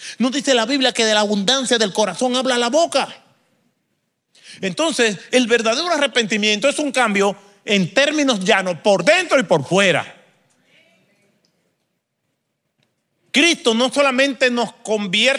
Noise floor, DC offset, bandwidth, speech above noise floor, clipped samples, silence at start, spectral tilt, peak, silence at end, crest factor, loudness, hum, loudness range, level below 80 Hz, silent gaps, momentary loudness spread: -73 dBFS; under 0.1%; 14.5 kHz; 56 dB; under 0.1%; 0 s; -3 dB/octave; -2 dBFS; 0 s; 18 dB; -17 LUFS; none; 5 LU; -72 dBFS; none; 6 LU